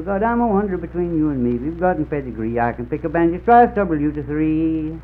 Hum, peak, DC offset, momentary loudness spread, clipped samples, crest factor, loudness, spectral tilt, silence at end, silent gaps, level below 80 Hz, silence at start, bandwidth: none; -2 dBFS; under 0.1%; 10 LU; under 0.1%; 18 dB; -19 LUFS; -11 dB/octave; 0 s; none; -36 dBFS; 0 s; 4.2 kHz